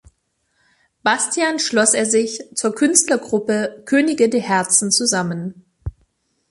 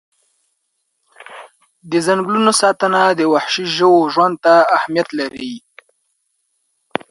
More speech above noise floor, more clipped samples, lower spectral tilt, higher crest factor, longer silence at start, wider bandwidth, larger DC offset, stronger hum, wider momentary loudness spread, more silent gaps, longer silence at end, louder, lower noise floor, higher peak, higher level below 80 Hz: second, 50 dB vs 56 dB; neither; about the same, -2.5 dB/octave vs -3.5 dB/octave; about the same, 20 dB vs 16 dB; second, 1.05 s vs 1.2 s; about the same, 12 kHz vs 11.5 kHz; neither; neither; about the same, 14 LU vs 16 LU; neither; second, 0.6 s vs 1.5 s; second, -17 LUFS vs -14 LUFS; about the same, -68 dBFS vs -70 dBFS; about the same, 0 dBFS vs 0 dBFS; first, -48 dBFS vs -66 dBFS